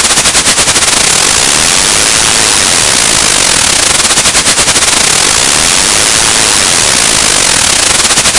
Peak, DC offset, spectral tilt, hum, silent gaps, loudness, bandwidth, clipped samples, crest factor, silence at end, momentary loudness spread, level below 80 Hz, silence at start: 0 dBFS; under 0.1%; 0 dB/octave; none; none; -4 LUFS; 12 kHz; 4%; 8 dB; 0 s; 0 LU; -30 dBFS; 0 s